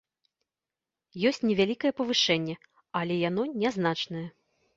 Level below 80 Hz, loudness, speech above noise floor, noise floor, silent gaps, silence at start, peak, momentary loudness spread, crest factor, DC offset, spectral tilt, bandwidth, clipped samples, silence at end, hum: -68 dBFS; -28 LUFS; over 62 dB; under -90 dBFS; none; 1.15 s; -10 dBFS; 13 LU; 20 dB; under 0.1%; -4.5 dB/octave; 8 kHz; under 0.1%; 0.5 s; none